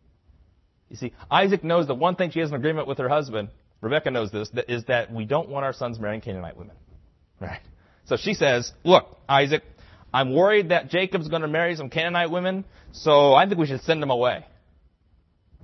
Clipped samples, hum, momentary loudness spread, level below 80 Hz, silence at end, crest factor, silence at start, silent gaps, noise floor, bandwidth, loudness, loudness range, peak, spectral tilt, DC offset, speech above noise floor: under 0.1%; none; 16 LU; -56 dBFS; 1.2 s; 22 dB; 0.95 s; none; -62 dBFS; 6.2 kHz; -23 LUFS; 7 LU; -2 dBFS; -5.5 dB/octave; under 0.1%; 40 dB